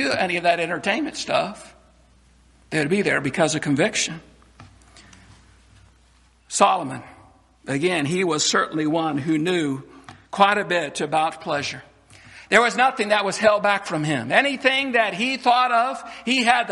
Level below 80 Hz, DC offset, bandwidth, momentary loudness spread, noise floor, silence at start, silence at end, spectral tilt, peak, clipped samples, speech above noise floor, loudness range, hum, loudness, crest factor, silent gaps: -60 dBFS; under 0.1%; 11.5 kHz; 10 LU; -56 dBFS; 0 s; 0 s; -3.5 dB/octave; -2 dBFS; under 0.1%; 35 dB; 7 LU; none; -21 LUFS; 22 dB; none